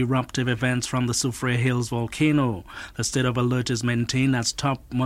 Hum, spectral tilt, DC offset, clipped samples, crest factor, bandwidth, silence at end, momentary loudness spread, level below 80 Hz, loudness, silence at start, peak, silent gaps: none; -5 dB/octave; under 0.1%; under 0.1%; 16 dB; 14.5 kHz; 0 s; 5 LU; -48 dBFS; -24 LUFS; 0 s; -8 dBFS; none